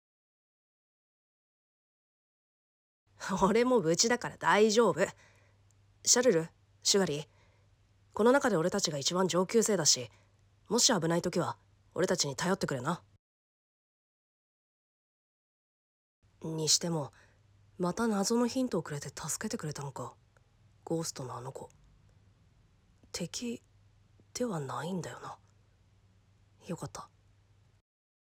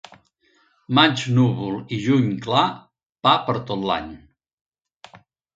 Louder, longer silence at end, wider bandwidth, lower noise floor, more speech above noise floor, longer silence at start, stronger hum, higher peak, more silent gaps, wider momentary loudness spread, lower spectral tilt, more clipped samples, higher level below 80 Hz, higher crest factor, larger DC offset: second, -30 LUFS vs -20 LUFS; first, 1.2 s vs 0.4 s; first, 17 kHz vs 7.8 kHz; first, -66 dBFS vs -62 dBFS; second, 35 dB vs 42 dB; first, 3.2 s vs 0.9 s; neither; second, -12 dBFS vs 0 dBFS; first, 13.19-16.22 s vs 3.06-3.13 s, 4.53-4.65 s; first, 18 LU vs 10 LU; second, -3.5 dB/octave vs -6 dB/octave; neither; second, -68 dBFS vs -56 dBFS; about the same, 22 dB vs 22 dB; neither